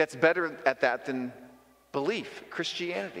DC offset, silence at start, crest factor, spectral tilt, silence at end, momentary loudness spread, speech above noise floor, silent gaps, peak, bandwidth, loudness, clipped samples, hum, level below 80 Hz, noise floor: under 0.1%; 0 s; 22 dB; -4.5 dB/octave; 0 s; 11 LU; 27 dB; none; -8 dBFS; 16 kHz; -30 LUFS; under 0.1%; none; -74 dBFS; -56 dBFS